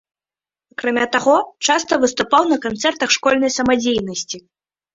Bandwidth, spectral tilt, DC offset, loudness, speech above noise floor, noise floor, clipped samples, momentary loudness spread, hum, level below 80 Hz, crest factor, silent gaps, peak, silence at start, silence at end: 8 kHz; -2.5 dB/octave; under 0.1%; -17 LUFS; over 73 dB; under -90 dBFS; under 0.1%; 10 LU; none; -54 dBFS; 18 dB; none; 0 dBFS; 0.8 s; 0.55 s